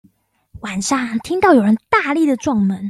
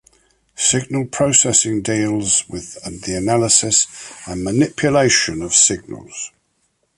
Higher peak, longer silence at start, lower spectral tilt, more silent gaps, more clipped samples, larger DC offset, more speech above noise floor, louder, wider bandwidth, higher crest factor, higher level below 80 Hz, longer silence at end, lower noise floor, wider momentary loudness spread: about the same, -2 dBFS vs 0 dBFS; about the same, 0.55 s vs 0.6 s; first, -5 dB/octave vs -3 dB/octave; neither; neither; neither; second, 41 dB vs 48 dB; about the same, -16 LUFS vs -15 LUFS; first, 13 kHz vs 11.5 kHz; about the same, 16 dB vs 18 dB; second, -52 dBFS vs -46 dBFS; second, 0 s vs 0.7 s; second, -56 dBFS vs -66 dBFS; second, 10 LU vs 17 LU